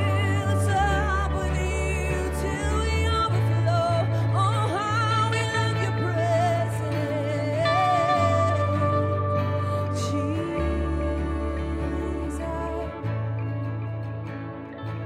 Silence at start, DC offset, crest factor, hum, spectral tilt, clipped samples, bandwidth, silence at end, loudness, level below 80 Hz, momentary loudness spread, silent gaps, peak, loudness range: 0 s; under 0.1%; 14 dB; none; -6.5 dB/octave; under 0.1%; 13 kHz; 0 s; -25 LUFS; -34 dBFS; 8 LU; none; -10 dBFS; 6 LU